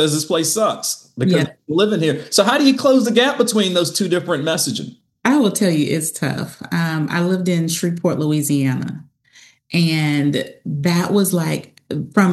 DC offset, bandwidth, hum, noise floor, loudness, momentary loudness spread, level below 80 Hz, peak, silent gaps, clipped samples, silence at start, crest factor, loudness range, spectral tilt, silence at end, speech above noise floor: under 0.1%; 13 kHz; none; -50 dBFS; -18 LUFS; 9 LU; -64 dBFS; 0 dBFS; none; under 0.1%; 0 s; 16 dB; 4 LU; -4.5 dB/octave; 0 s; 33 dB